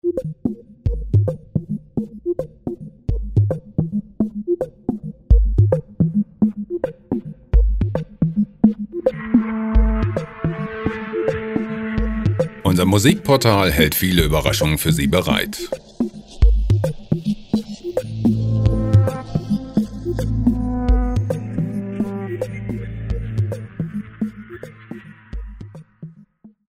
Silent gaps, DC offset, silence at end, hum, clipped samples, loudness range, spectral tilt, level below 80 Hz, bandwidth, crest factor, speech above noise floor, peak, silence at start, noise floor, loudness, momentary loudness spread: none; under 0.1%; 0.25 s; none; under 0.1%; 9 LU; -6 dB/octave; -26 dBFS; 15.5 kHz; 18 dB; 31 dB; 0 dBFS; 0.05 s; -48 dBFS; -21 LUFS; 12 LU